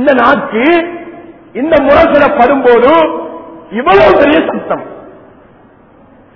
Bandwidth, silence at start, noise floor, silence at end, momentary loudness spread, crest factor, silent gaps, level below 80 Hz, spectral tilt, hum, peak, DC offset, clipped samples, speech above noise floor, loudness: 6 kHz; 0 s; -41 dBFS; 1.25 s; 19 LU; 10 dB; none; -38 dBFS; -7 dB/octave; none; 0 dBFS; under 0.1%; 0.9%; 33 dB; -8 LUFS